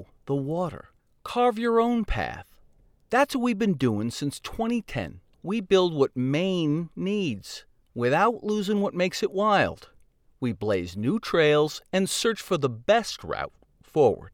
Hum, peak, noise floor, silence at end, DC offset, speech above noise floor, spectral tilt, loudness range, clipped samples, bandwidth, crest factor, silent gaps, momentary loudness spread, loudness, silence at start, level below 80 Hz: none; -8 dBFS; -58 dBFS; 0.05 s; under 0.1%; 33 dB; -5.5 dB/octave; 2 LU; under 0.1%; 17.5 kHz; 18 dB; none; 11 LU; -26 LUFS; 0 s; -48 dBFS